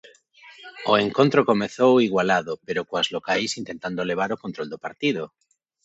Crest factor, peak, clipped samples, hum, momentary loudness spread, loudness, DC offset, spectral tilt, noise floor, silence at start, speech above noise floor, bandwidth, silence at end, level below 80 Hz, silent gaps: 20 dB; -4 dBFS; under 0.1%; none; 14 LU; -23 LUFS; under 0.1%; -5 dB/octave; -50 dBFS; 0.45 s; 28 dB; 8.2 kHz; 0.55 s; -64 dBFS; none